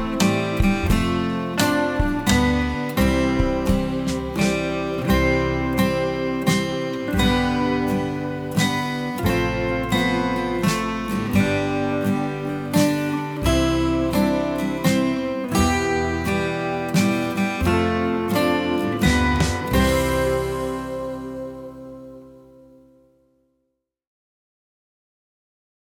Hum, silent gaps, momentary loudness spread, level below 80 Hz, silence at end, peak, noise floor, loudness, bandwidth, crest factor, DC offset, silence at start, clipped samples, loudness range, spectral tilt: none; none; 6 LU; -32 dBFS; 3.5 s; -4 dBFS; -75 dBFS; -21 LUFS; 19.5 kHz; 18 dB; under 0.1%; 0 s; under 0.1%; 3 LU; -5.5 dB/octave